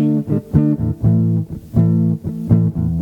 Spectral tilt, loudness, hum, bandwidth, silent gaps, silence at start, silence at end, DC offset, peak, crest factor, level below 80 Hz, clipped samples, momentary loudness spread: -11.5 dB/octave; -17 LUFS; none; 2.6 kHz; none; 0 s; 0 s; under 0.1%; 0 dBFS; 16 dB; -34 dBFS; under 0.1%; 5 LU